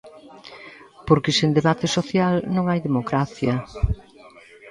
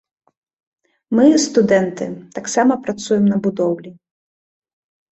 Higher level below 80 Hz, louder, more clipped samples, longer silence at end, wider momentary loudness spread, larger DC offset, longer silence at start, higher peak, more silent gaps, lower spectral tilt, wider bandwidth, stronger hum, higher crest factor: first, -36 dBFS vs -60 dBFS; second, -21 LUFS vs -17 LUFS; neither; second, 0 s vs 1.2 s; first, 22 LU vs 14 LU; neither; second, 0.05 s vs 1.1 s; about the same, -2 dBFS vs -2 dBFS; neither; about the same, -6 dB/octave vs -5 dB/octave; first, 11 kHz vs 8.2 kHz; neither; about the same, 20 dB vs 18 dB